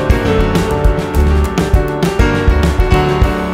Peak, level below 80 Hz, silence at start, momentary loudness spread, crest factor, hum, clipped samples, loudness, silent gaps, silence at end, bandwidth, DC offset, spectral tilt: 0 dBFS; -16 dBFS; 0 s; 2 LU; 12 dB; none; under 0.1%; -13 LUFS; none; 0 s; 16 kHz; under 0.1%; -6.5 dB/octave